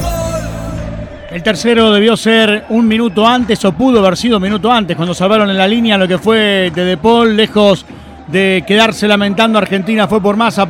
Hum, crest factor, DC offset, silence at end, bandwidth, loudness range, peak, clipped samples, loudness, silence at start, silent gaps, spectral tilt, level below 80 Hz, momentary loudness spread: none; 10 dB; under 0.1%; 0 s; 16.5 kHz; 1 LU; 0 dBFS; under 0.1%; -11 LUFS; 0 s; none; -5 dB/octave; -34 dBFS; 8 LU